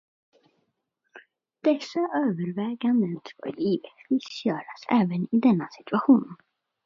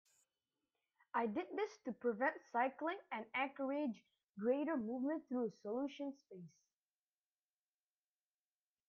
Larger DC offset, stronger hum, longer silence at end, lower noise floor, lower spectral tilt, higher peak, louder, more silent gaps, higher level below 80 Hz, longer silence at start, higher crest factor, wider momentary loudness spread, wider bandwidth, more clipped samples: neither; second, none vs 50 Hz at -75 dBFS; second, 0.5 s vs 2.4 s; second, -77 dBFS vs under -90 dBFS; about the same, -7.5 dB/octave vs -6.5 dB/octave; first, -8 dBFS vs -24 dBFS; first, -26 LUFS vs -42 LUFS; second, none vs 4.30-4.34 s; first, -74 dBFS vs under -90 dBFS; about the same, 1.15 s vs 1.15 s; about the same, 20 dB vs 20 dB; second, 9 LU vs 13 LU; about the same, 7.2 kHz vs 7.8 kHz; neither